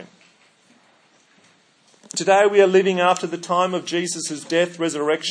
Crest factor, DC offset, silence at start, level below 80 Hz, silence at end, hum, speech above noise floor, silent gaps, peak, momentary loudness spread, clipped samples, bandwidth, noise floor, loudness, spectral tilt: 18 dB; under 0.1%; 0 s; -80 dBFS; 0 s; none; 38 dB; none; -2 dBFS; 10 LU; under 0.1%; 10.5 kHz; -57 dBFS; -19 LUFS; -3.5 dB/octave